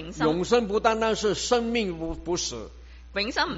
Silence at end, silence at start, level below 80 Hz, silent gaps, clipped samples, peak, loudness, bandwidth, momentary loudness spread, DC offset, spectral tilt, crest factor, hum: 0 s; 0 s; -44 dBFS; none; under 0.1%; -6 dBFS; -26 LUFS; 8 kHz; 11 LU; under 0.1%; -3 dB/octave; 20 dB; none